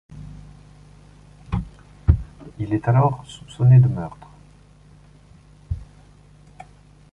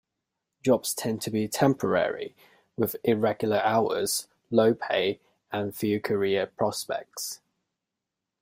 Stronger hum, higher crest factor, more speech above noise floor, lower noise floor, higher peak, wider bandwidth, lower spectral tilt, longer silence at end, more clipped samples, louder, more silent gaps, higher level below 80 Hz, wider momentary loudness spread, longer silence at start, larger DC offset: first, 50 Hz at -45 dBFS vs none; about the same, 20 dB vs 20 dB; second, 32 dB vs 60 dB; second, -49 dBFS vs -86 dBFS; first, -2 dBFS vs -8 dBFS; second, 8.4 kHz vs 16 kHz; first, -9 dB/octave vs -4.5 dB/octave; first, 1.3 s vs 1.05 s; neither; first, -21 LUFS vs -27 LUFS; neither; first, -34 dBFS vs -66 dBFS; first, 26 LU vs 11 LU; second, 0.15 s vs 0.65 s; neither